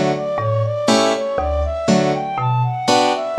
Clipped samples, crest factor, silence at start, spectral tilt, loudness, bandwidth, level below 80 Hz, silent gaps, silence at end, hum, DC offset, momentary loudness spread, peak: under 0.1%; 16 dB; 0 s; -5.5 dB/octave; -18 LUFS; 13 kHz; -32 dBFS; none; 0 s; none; under 0.1%; 5 LU; -2 dBFS